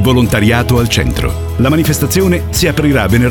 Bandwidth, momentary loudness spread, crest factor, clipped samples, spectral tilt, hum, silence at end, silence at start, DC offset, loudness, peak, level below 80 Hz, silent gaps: 19.5 kHz; 4 LU; 10 dB; under 0.1%; -5.5 dB/octave; none; 0 s; 0 s; under 0.1%; -12 LUFS; 0 dBFS; -22 dBFS; none